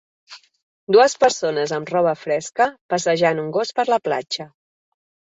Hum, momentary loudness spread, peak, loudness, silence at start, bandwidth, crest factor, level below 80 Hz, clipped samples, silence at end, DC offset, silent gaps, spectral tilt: none; 9 LU; -2 dBFS; -19 LUFS; 0.3 s; 8.2 kHz; 18 dB; -66 dBFS; under 0.1%; 0.85 s; under 0.1%; 0.63-0.87 s, 2.81-2.89 s; -3.5 dB/octave